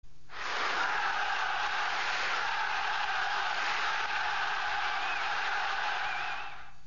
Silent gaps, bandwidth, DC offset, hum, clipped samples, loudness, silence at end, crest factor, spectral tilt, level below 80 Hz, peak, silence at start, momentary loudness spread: none; 7.2 kHz; 1%; none; under 0.1%; -31 LUFS; 0.05 s; 12 dB; 2.5 dB/octave; -60 dBFS; -20 dBFS; 0 s; 4 LU